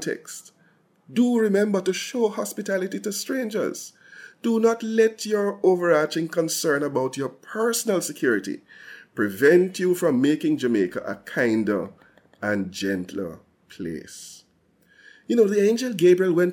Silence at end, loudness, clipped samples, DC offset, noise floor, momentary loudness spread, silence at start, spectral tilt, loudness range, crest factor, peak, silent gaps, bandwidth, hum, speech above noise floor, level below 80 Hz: 0 s; -23 LUFS; under 0.1%; under 0.1%; -62 dBFS; 16 LU; 0 s; -5 dB/octave; 6 LU; 16 dB; -6 dBFS; none; 17 kHz; none; 40 dB; -70 dBFS